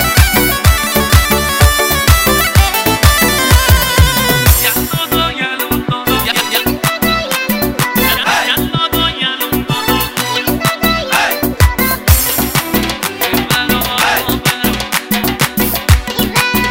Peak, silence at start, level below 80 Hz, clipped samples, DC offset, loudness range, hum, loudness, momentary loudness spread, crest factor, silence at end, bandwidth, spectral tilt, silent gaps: 0 dBFS; 0 s; -20 dBFS; 0.6%; under 0.1%; 4 LU; none; -12 LUFS; 5 LU; 12 dB; 0 s; over 20 kHz; -3.5 dB/octave; none